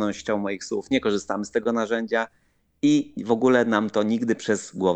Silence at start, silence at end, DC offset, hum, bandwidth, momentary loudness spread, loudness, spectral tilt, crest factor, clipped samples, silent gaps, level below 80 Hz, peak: 0 s; 0 s; under 0.1%; none; 9 kHz; 7 LU; -24 LUFS; -5 dB/octave; 18 dB; under 0.1%; none; -62 dBFS; -6 dBFS